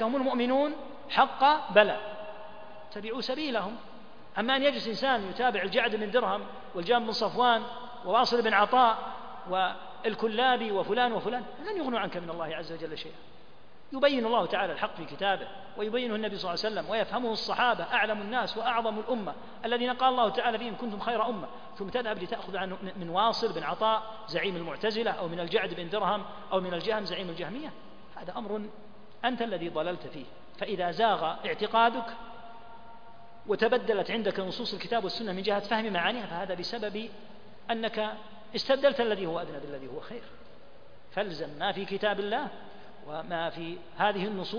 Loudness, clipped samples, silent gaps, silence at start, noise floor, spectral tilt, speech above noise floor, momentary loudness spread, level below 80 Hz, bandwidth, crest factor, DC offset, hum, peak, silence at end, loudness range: -30 LUFS; under 0.1%; none; 0 s; -57 dBFS; -5.5 dB/octave; 27 dB; 15 LU; -66 dBFS; 5.4 kHz; 26 dB; 0.6%; none; -4 dBFS; 0 s; 7 LU